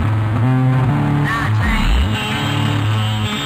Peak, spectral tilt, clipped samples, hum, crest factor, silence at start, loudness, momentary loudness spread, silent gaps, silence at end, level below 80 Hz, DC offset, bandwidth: -4 dBFS; -6 dB/octave; under 0.1%; none; 10 dB; 0 s; -17 LUFS; 3 LU; none; 0 s; -24 dBFS; under 0.1%; 15.5 kHz